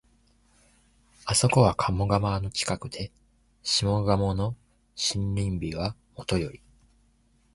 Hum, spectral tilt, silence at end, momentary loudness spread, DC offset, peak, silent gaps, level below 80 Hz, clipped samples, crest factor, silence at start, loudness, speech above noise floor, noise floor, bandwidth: none; -4.5 dB/octave; 1 s; 16 LU; under 0.1%; -6 dBFS; none; -44 dBFS; under 0.1%; 22 dB; 1.25 s; -27 LUFS; 38 dB; -64 dBFS; 11.5 kHz